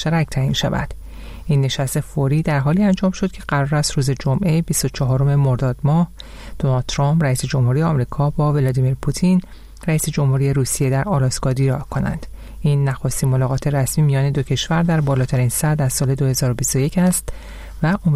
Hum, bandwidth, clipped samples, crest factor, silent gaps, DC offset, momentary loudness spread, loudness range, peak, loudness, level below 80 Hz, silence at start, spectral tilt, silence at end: none; 15 kHz; under 0.1%; 12 dB; none; 0.1%; 6 LU; 1 LU; -6 dBFS; -19 LUFS; -36 dBFS; 0 s; -6 dB/octave; 0 s